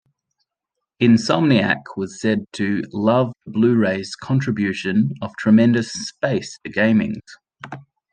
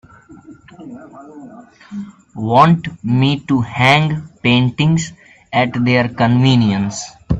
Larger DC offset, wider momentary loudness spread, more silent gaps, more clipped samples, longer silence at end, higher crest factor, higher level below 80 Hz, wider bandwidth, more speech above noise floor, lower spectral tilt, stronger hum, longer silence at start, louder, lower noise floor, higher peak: neither; second, 12 LU vs 21 LU; neither; neither; first, 0.3 s vs 0 s; about the same, 18 dB vs 16 dB; second, -60 dBFS vs -42 dBFS; first, 9.4 kHz vs 8.4 kHz; first, 63 dB vs 25 dB; about the same, -6.5 dB/octave vs -6 dB/octave; neither; first, 1 s vs 0.3 s; second, -19 LUFS vs -15 LUFS; first, -81 dBFS vs -40 dBFS; about the same, -2 dBFS vs 0 dBFS